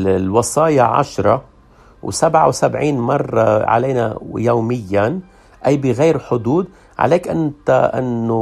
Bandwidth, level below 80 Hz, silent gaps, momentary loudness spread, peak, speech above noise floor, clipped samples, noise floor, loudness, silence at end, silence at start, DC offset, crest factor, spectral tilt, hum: 14 kHz; -48 dBFS; none; 7 LU; 0 dBFS; 31 dB; under 0.1%; -46 dBFS; -16 LUFS; 0 s; 0 s; under 0.1%; 16 dB; -6 dB/octave; none